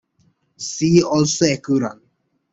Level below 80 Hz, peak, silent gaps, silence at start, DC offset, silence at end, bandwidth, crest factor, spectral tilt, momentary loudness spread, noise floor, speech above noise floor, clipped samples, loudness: -54 dBFS; -2 dBFS; none; 0.6 s; under 0.1%; 0.6 s; 8.2 kHz; 18 dB; -5 dB/octave; 13 LU; -65 dBFS; 48 dB; under 0.1%; -18 LUFS